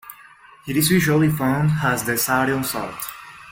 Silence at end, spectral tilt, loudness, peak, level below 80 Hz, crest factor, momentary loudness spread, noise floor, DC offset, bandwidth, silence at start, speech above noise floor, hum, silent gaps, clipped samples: 0 s; -5 dB/octave; -20 LUFS; -4 dBFS; -50 dBFS; 16 dB; 16 LU; -47 dBFS; under 0.1%; 17 kHz; 0.05 s; 28 dB; none; none; under 0.1%